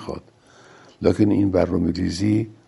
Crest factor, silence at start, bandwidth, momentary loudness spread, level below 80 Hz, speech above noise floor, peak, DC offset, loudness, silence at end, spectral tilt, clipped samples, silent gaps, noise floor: 18 dB; 0 s; 11.5 kHz; 9 LU; -46 dBFS; 31 dB; -2 dBFS; under 0.1%; -21 LUFS; 0.15 s; -7.5 dB/octave; under 0.1%; none; -51 dBFS